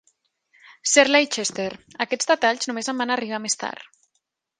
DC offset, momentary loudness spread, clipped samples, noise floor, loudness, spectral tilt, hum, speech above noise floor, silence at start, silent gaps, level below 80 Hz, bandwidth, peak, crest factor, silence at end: under 0.1%; 14 LU; under 0.1%; -75 dBFS; -22 LUFS; -1 dB/octave; none; 52 dB; 0.85 s; none; -70 dBFS; 10.5 kHz; 0 dBFS; 24 dB; 0.75 s